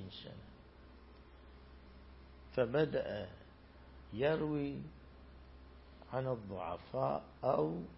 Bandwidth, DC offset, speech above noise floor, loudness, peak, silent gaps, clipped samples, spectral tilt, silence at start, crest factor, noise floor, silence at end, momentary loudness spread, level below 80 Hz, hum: 5.6 kHz; under 0.1%; 21 dB; -38 LUFS; -20 dBFS; none; under 0.1%; -6 dB/octave; 0 s; 20 dB; -58 dBFS; 0 s; 24 LU; -60 dBFS; none